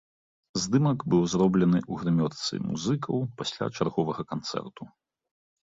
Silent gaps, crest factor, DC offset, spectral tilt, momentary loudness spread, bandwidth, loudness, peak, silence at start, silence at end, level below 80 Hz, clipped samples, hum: none; 16 dB; under 0.1%; -6 dB/octave; 11 LU; 7.8 kHz; -27 LUFS; -12 dBFS; 0.55 s; 0.8 s; -58 dBFS; under 0.1%; none